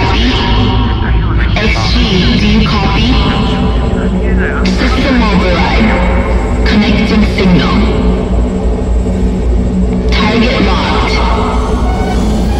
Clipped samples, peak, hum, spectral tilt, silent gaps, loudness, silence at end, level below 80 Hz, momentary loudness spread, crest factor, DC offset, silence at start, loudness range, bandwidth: under 0.1%; 0 dBFS; none; -6.5 dB/octave; none; -11 LUFS; 0 s; -14 dBFS; 4 LU; 10 dB; under 0.1%; 0 s; 2 LU; 8.4 kHz